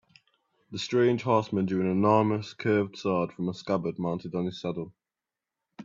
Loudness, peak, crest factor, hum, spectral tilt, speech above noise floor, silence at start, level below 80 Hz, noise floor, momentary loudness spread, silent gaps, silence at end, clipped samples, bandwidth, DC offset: -28 LUFS; -8 dBFS; 20 dB; none; -7 dB/octave; 62 dB; 0.7 s; -68 dBFS; -90 dBFS; 11 LU; none; 0 s; under 0.1%; 7.6 kHz; under 0.1%